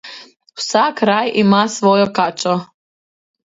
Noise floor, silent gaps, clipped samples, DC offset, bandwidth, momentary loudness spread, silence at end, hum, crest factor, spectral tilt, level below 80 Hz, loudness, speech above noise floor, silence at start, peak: under -90 dBFS; none; under 0.1%; under 0.1%; 8 kHz; 11 LU; 0.8 s; none; 16 dB; -4.5 dB/octave; -62 dBFS; -15 LUFS; over 75 dB; 0.05 s; 0 dBFS